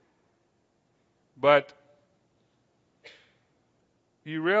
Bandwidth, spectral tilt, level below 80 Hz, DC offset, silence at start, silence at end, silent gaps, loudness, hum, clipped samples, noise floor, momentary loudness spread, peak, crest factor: 7.4 kHz; -6.5 dB/octave; -80 dBFS; under 0.1%; 1.45 s; 0 s; none; -25 LUFS; none; under 0.1%; -71 dBFS; 27 LU; -6 dBFS; 26 dB